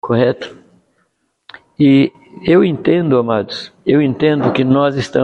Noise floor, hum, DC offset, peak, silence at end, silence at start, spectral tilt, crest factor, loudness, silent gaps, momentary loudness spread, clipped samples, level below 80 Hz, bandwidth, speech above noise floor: -64 dBFS; none; under 0.1%; 0 dBFS; 0 s; 0.05 s; -7.5 dB/octave; 14 dB; -14 LUFS; none; 10 LU; under 0.1%; -52 dBFS; 8.4 kHz; 51 dB